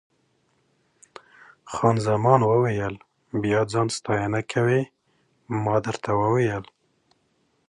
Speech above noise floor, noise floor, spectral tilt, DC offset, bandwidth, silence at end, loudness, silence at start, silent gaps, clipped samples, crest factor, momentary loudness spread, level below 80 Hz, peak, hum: 46 dB; -68 dBFS; -6.5 dB/octave; under 0.1%; 10.5 kHz; 1.05 s; -23 LUFS; 1.65 s; none; under 0.1%; 20 dB; 13 LU; -56 dBFS; -4 dBFS; none